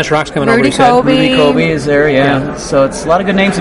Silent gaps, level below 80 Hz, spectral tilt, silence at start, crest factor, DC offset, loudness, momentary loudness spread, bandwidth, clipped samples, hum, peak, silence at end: none; -34 dBFS; -5.5 dB/octave; 0 s; 10 dB; under 0.1%; -10 LUFS; 4 LU; 11.5 kHz; under 0.1%; none; 0 dBFS; 0 s